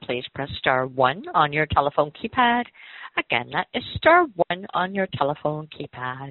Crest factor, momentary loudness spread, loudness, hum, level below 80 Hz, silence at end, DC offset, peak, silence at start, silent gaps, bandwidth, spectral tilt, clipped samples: 22 dB; 13 LU; -23 LUFS; none; -52 dBFS; 0 s; under 0.1%; -2 dBFS; 0 s; none; 4.5 kHz; -3 dB/octave; under 0.1%